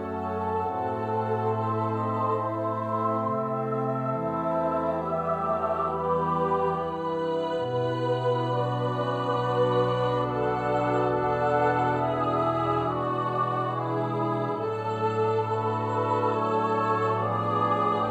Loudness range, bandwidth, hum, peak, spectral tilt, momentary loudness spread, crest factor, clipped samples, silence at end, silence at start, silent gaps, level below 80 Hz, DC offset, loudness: 2 LU; 8.4 kHz; none; -12 dBFS; -8 dB/octave; 4 LU; 14 dB; under 0.1%; 0 s; 0 s; none; -56 dBFS; under 0.1%; -27 LUFS